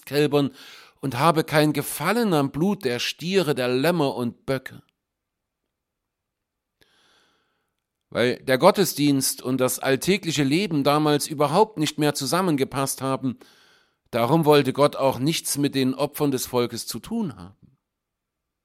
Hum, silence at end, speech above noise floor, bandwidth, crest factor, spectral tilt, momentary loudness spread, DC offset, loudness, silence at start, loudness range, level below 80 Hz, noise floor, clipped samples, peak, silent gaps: none; 1.15 s; 60 dB; 16.5 kHz; 22 dB; -5 dB/octave; 11 LU; under 0.1%; -22 LUFS; 0.05 s; 6 LU; -60 dBFS; -82 dBFS; under 0.1%; -2 dBFS; none